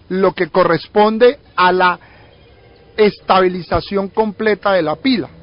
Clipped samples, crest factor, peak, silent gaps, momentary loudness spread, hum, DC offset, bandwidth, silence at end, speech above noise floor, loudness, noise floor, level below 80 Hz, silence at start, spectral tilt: under 0.1%; 14 dB; -2 dBFS; none; 7 LU; none; under 0.1%; 5.4 kHz; 0.15 s; 30 dB; -15 LUFS; -45 dBFS; -42 dBFS; 0.1 s; -10.5 dB/octave